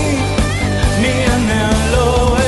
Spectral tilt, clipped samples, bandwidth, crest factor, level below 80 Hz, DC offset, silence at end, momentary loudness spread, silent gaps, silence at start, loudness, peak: -5 dB/octave; under 0.1%; 12 kHz; 10 dB; -20 dBFS; under 0.1%; 0 s; 3 LU; none; 0 s; -14 LUFS; -2 dBFS